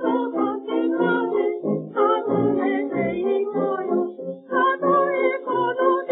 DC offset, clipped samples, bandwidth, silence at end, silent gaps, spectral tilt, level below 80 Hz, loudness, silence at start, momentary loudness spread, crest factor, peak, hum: under 0.1%; under 0.1%; 4 kHz; 0 s; none; -11 dB/octave; -66 dBFS; -22 LUFS; 0 s; 5 LU; 14 dB; -6 dBFS; none